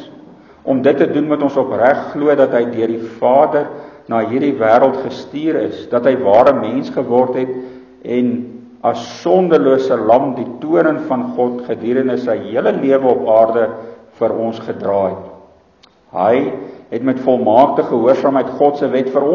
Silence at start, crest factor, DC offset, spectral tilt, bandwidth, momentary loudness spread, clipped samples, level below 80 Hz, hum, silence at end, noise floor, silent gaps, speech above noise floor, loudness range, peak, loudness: 0 s; 14 dB; under 0.1%; -7.5 dB/octave; 7 kHz; 11 LU; under 0.1%; -56 dBFS; none; 0 s; -50 dBFS; none; 36 dB; 3 LU; 0 dBFS; -15 LUFS